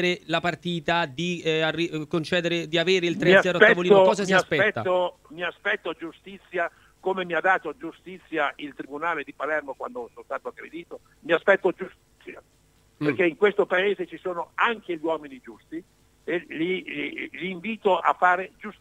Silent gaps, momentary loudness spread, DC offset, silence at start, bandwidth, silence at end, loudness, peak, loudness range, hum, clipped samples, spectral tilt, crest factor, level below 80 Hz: none; 20 LU; under 0.1%; 0 s; 12.5 kHz; 0.1 s; -24 LUFS; -2 dBFS; 9 LU; none; under 0.1%; -5 dB/octave; 24 dB; -64 dBFS